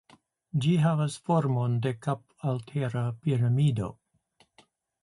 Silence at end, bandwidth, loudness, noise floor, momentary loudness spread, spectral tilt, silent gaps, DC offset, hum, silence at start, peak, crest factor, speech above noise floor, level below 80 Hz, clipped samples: 1.1 s; 11.5 kHz; -28 LUFS; -67 dBFS; 9 LU; -7.5 dB/octave; none; under 0.1%; none; 0.55 s; -12 dBFS; 16 dB; 40 dB; -62 dBFS; under 0.1%